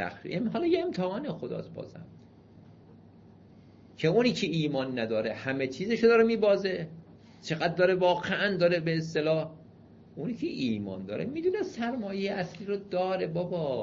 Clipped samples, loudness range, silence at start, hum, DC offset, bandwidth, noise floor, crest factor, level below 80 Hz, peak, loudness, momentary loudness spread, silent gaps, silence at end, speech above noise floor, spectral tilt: under 0.1%; 7 LU; 0 s; none; under 0.1%; 7.6 kHz; -54 dBFS; 18 dB; -64 dBFS; -10 dBFS; -29 LUFS; 13 LU; none; 0 s; 25 dB; -6.5 dB/octave